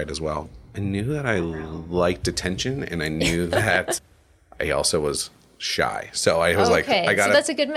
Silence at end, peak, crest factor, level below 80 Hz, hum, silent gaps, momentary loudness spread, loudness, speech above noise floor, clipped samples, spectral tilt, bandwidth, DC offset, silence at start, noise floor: 0 s; -4 dBFS; 20 dB; -44 dBFS; none; none; 11 LU; -22 LUFS; 30 dB; under 0.1%; -4 dB/octave; 15 kHz; under 0.1%; 0 s; -52 dBFS